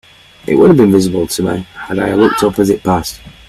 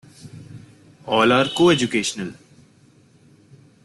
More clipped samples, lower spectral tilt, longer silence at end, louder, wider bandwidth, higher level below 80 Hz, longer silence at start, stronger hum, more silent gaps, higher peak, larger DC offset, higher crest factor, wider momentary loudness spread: neither; first, -6 dB/octave vs -4.5 dB/octave; second, 0.15 s vs 1.5 s; first, -12 LUFS vs -18 LUFS; first, 14.5 kHz vs 12 kHz; first, -40 dBFS vs -58 dBFS; first, 0.45 s vs 0.25 s; neither; neither; first, 0 dBFS vs -4 dBFS; neither; second, 12 dB vs 20 dB; second, 13 LU vs 25 LU